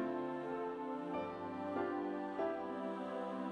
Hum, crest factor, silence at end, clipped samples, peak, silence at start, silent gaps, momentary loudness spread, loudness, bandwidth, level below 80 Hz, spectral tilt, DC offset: none; 14 dB; 0 s; under 0.1%; -28 dBFS; 0 s; none; 3 LU; -42 LUFS; 9.8 kHz; -78 dBFS; -7.5 dB/octave; under 0.1%